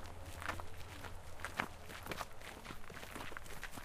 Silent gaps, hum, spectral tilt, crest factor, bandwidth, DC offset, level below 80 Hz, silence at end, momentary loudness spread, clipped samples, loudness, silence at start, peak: none; none; -3.5 dB/octave; 30 dB; 15.5 kHz; under 0.1%; -54 dBFS; 0 s; 8 LU; under 0.1%; -47 LUFS; 0 s; -16 dBFS